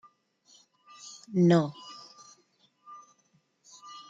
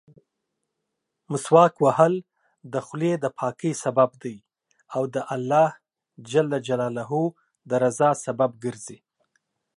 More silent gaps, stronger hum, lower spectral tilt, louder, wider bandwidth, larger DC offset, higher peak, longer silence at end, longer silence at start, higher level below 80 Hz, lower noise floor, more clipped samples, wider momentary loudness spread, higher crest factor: neither; neither; about the same, -7 dB/octave vs -6 dB/octave; second, -26 LUFS vs -23 LUFS; second, 7.8 kHz vs 11.5 kHz; neither; second, -12 dBFS vs -4 dBFS; second, 0.1 s vs 0.85 s; second, 1.05 s vs 1.3 s; second, -78 dBFS vs -72 dBFS; second, -70 dBFS vs -81 dBFS; neither; first, 28 LU vs 13 LU; about the same, 22 dB vs 22 dB